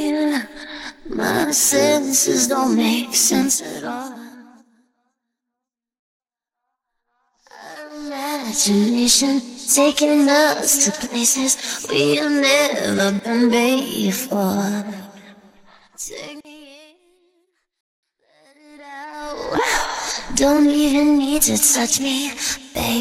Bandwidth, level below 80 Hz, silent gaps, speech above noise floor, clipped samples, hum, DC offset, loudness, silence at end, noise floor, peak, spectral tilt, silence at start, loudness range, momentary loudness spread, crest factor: 16.5 kHz; -48 dBFS; 5.99-6.20 s, 17.80-18.03 s; 67 dB; under 0.1%; none; under 0.1%; -17 LUFS; 0 s; -84 dBFS; -2 dBFS; -2.5 dB/octave; 0 s; 20 LU; 18 LU; 18 dB